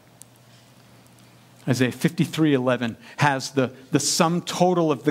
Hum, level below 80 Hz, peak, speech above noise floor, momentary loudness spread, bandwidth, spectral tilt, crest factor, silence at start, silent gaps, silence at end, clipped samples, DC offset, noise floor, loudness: none; -68 dBFS; -4 dBFS; 30 dB; 6 LU; 16.5 kHz; -5 dB/octave; 20 dB; 1.65 s; none; 0 s; under 0.1%; under 0.1%; -52 dBFS; -22 LUFS